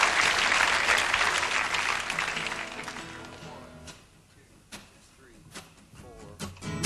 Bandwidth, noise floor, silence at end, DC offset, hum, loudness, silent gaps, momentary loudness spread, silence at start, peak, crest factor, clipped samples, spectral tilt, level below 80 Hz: 16 kHz; -57 dBFS; 0 s; under 0.1%; none; -25 LUFS; none; 24 LU; 0 s; -8 dBFS; 22 dB; under 0.1%; -1 dB/octave; -54 dBFS